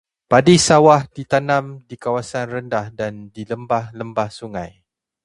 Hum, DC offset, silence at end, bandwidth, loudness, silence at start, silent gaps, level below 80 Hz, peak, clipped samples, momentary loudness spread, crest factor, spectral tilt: none; under 0.1%; 0.55 s; 11.5 kHz; -17 LUFS; 0.3 s; none; -50 dBFS; 0 dBFS; under 0.1%; 18 LU; 18 dB; -5 dB/octave